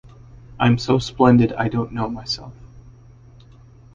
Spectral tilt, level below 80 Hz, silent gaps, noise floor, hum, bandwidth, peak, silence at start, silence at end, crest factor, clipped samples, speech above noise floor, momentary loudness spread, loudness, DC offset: -7 dB/octave; -44 dBFS; none; -46 dBFS; none; 7.4 kHz; -2 dBFS; 0.35 s; 1.05 s; 20 dB; under 0.1%; 28 dB; 13 LU; -19 LUFS; under 0.1%